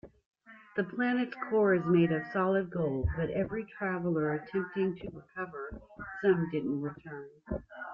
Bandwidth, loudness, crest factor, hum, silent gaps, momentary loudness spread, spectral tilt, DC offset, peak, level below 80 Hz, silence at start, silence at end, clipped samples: 5.6 kHz; -32 LUFS; 18 dB; none; 0.26-0.31 s; 16 LU; -10 dB/octave; under 0.1%; -14 dBFS; -52 dBFS; 0.05 s; 0 s; under 0.1%